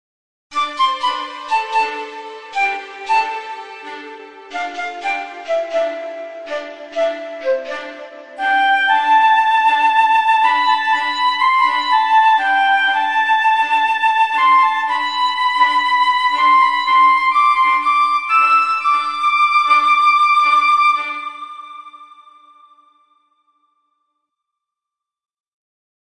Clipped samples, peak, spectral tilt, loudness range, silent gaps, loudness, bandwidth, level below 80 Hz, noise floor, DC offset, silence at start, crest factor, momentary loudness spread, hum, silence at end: under 0.1%; -2 dBFS; 0 dB/octave; 10 LU; none; -14 LUFS; 11 kHz; -72 dBFS; -85 dBFS; under 0.1%; 0.5 s; 16 dB; 16 LU; none; 4.1 s